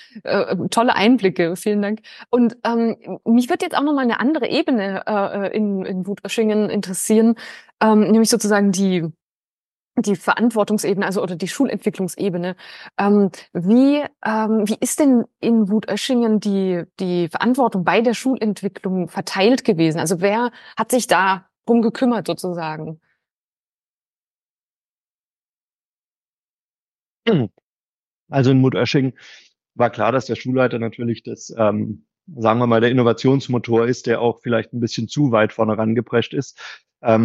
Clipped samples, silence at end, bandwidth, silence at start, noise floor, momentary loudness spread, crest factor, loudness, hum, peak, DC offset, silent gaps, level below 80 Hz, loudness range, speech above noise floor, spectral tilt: under 0.1%; 0 s; 12.5 kHz; 0.15 s; under -90 dBFS; 10 LU; 18 dB; -19 LUFS; none; -2 dBFS; under 0.1%; 7.74-7.78 s, 9.22-9.44 s, 9.50-9.91 s, 23.33-26.96 s, 27.02-27.21 s, 27.63-28.27 s; -68 dBFS; 4 LU; over 72 dB; -5.5 dB/octave